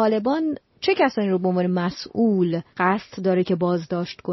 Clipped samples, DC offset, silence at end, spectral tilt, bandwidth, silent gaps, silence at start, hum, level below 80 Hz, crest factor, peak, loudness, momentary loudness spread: under 0.1%; under 0.1%; 0 s; -5.5 dB/octave; 6 kHz; none; 0 s; none; -62 dBFS; 16 dB; -6 dBFS; -22 LUFS; 6 LU